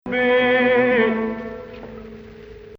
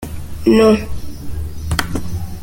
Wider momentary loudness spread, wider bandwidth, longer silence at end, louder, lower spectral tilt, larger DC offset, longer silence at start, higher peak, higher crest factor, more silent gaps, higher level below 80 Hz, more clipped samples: first, 22 LU vs 18 LU; second, 5.6 kHz vs 17 kHz; about the same, 0 s vs 0 s; about the same, -18 LUFS vs -16 LUFS; about the same, -7 dB/octave vs -6 dB/octave; neither; about the same, 0.05 s vs 0 s; second, -6 dBFS vs -2 dBFS; about the same, 14 dB vs 16 dB; neither; second, -50 dBFS vs -30 dBFS; neither